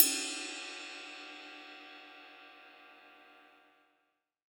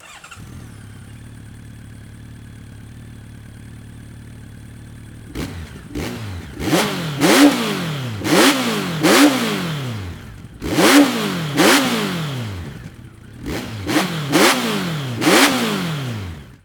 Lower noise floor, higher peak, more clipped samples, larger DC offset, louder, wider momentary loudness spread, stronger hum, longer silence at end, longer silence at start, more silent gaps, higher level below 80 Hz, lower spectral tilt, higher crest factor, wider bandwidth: first, -80 dBFS vs -39 dBFS; second, -6 dBFS vs 0 dBFS; neither; neither; second, -37 LUFS vs -16 LUFS; second, 21 LU vs 26 LU; neither; first, 1.1 s vs 0.15 s; about the same, 0 s vs 0.05 s; neither; second, under -90 dBFS vs -44 dBFS; second, 2.5 dB/octave vs -4 dB/octave; first, 34 dB vs 20 dB; about the same, over 20 kHz vs over 20 kHz